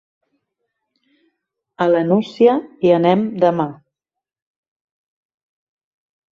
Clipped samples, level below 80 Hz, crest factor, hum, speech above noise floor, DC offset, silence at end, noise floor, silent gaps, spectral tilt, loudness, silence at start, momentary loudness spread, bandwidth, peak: under 0.1%; -66 dBFS; 18 dB; none; 70 dB; under 0.1%; 2.6 s; -85 dBFS; none; -8.5 dB/octave; -16 LUFS; 1.8 s; 7 LU; 7.2 kHz; -2 dBFS